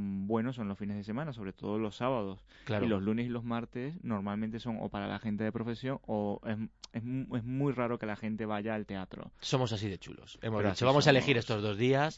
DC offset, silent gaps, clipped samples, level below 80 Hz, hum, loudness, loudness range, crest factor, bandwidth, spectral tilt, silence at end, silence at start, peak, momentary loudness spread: under 0.1%; none; under 0.1%; -62 dBFS; none; -34 LUFS; 6 LU; 24 dB; 8 kHz; -6 dB/octave; 0 s; 0 s; -10 dBFS; 12 LU